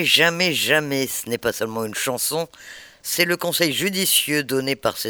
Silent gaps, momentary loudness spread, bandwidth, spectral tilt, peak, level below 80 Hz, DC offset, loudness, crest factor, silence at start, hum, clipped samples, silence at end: none; 10 LU; over 20 kHz; -2.5 dB/octave; 0 dBFS; -60 dBFS; under 0.1%; -20 LUFS; 22 dB; 0 s; none; under 0.1%; 0 s